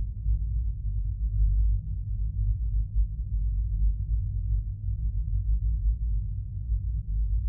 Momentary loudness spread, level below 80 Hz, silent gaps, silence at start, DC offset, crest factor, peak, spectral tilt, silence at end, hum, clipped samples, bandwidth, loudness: 4 LU; -28 dBFS; none; 0 s; under 0.1%; 12 dB; -16 dBFS; -14.5 dB/octave; 0 s; none; under 0.1%; 0.5 kHz; -31 LUFS